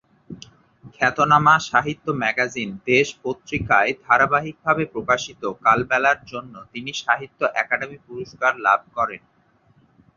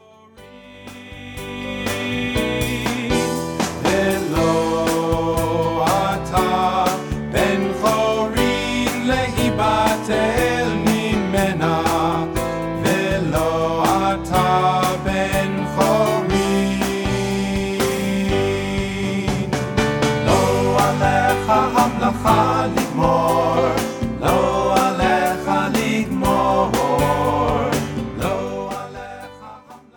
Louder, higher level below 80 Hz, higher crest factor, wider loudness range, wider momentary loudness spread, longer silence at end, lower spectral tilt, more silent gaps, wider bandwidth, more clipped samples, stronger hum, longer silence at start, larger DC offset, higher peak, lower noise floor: about the same, -20 LUFS vs -19 LUFS; second, -54 dBFS vs -36 dBFS; about the same, 20 dB vs 18 dB; about the same, 4 LU vs 3 LU; first, 17 LU vs 7 LU; first, 1 s vs 0.2 s; about the same, -4.5 dB/octave vs -5 dB/octave; neither; second, 7.6 kHz vs 19.5 kHz; neither; neither; about the same, 0.3 s vs 0.35 s; neither; about the same, -2 dBFS vs -2 dBFS; first, -59 dBFS vs -45 dBFS